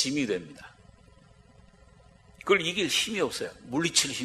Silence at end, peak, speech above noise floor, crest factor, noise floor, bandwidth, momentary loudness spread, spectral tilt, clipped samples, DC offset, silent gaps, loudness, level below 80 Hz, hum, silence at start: 0 s; -6 dBFS; 28 dB; 24 dB; -56 dBFS; 14.5 kHz; 15 LU; -2.5 dB/octave; under 0.1%; under 0.1%; none; -27 LUFS; -62 dBFS; none; 0 s